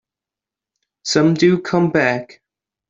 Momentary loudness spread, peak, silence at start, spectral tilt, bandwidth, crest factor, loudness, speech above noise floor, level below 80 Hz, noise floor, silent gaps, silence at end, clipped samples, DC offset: 10 LU; -2 dBFS; 1.05 s; -5.5 dB/octave; 7.8 kHz; 16 dB; -16 LUFS; 72 dB; -60 dBFS; -88 dBFS; none; 0.65 s; under 0.1%; under 0.1%